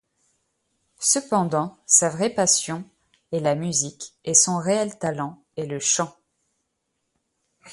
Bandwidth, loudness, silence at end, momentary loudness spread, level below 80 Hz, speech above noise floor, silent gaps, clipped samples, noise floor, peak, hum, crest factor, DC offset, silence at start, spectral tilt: 11.5 kHz; -21 LUFS; 0 s; 15 LU; -66 dBFS; 54 dB; none; under 0.1%; -76 dBFS; -2 dBFS; none; 24 dB; under 0.1%; 1 s; -3 dB/octave